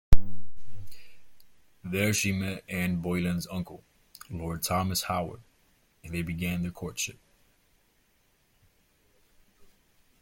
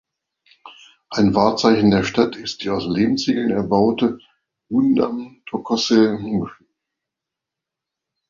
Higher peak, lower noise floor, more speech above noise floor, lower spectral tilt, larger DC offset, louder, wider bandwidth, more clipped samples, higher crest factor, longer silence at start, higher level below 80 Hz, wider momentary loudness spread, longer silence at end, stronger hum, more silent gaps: about the same, -2 dBFS vs -2 dBFS; second, -68 dBFS vs -85 dBFS; second, 37 dB vs 67 dB; second, -4.5 dB/octave vs -6 dB/octave; neither; second, -31 LUFS vs -19 LUFS; first, 16.5 kHz vs 7.6 kHz; neither; first, 24 dB vs 18 dB; second, 0.1 s vs 0.65 s; first, -36 dBFS vs -52 dBFS; first, 23 LU vs 12 LU; first, 3.1 s vs 1.75 s; neither; neither